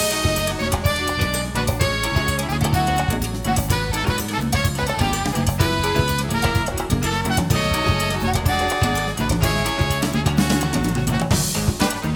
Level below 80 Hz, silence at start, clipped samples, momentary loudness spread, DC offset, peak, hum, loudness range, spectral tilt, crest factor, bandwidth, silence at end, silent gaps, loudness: -30 dBFS; 0 s; under 0.1%; 3 LU; under 0.1%; -4 dBFS; none; 1 LU; -4.5 dB/octave; 16 dB; over 20 kHz; 0 s; none; -20 LUFS